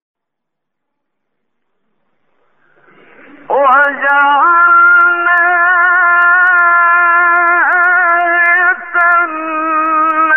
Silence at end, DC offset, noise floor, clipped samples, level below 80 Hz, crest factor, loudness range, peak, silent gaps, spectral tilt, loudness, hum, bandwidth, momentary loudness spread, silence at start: 0 s; 0.5%; -78 dBFS; under 0.1%; -68 dBFS; 10 dB; 7 LU; 0 dBFS; none; -4 dB/octave; -9 LUFS; none; 3.4 kHz; 6 LU; 3.5 s